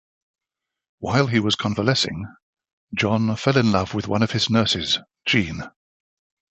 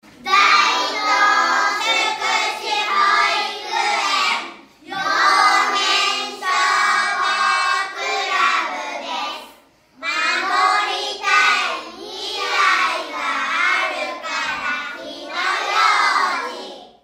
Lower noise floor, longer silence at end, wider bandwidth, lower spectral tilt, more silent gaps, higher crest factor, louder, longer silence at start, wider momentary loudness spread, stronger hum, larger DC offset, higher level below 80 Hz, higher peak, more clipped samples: first, -86 dBFS vs -50 dBFS; first, 0.8 s vs 0.15 s; second, 8.4 kHz vs 16 kHz; first, -5 dB/octave vs 1 dB/octave; first, 2.42-2.53 s, 2.73-2.88 s vs none; first, 22 dB vs 16 dB; second, -21 LUFS vs -17 LUFS; first, 1 s vs 0.2 s; about the same, 13 LU vs 11 LU; neither; neither; first, -48 dBFS vs -66 dBFS; about the same, -2 dBFS vs -2 dBFS; neither